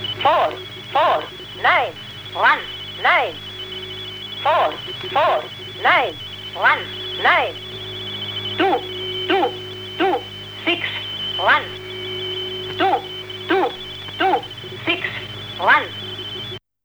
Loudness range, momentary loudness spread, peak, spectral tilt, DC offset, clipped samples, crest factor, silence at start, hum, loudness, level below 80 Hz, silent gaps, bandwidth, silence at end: 3 LU; 13 LU; -4 dBFS; -4.5 dB/octave; under 0.1%; under 0.1%; 16 dB; 0 s; 50 Hz at -55 dBFS; -20 LUFS; -54 dBFS; none; over 20 kHz; 0.25 s